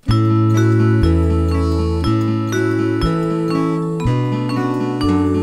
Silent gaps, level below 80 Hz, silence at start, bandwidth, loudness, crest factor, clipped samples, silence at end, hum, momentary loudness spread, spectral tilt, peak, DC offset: none; -28 dBFS; 0.05 s; 12 kHz; -17 LUFS; 12 dB; under 0.1%; 0 s; none; 5 LU; -8 dB/octave; -2 dBFS; under 0.1%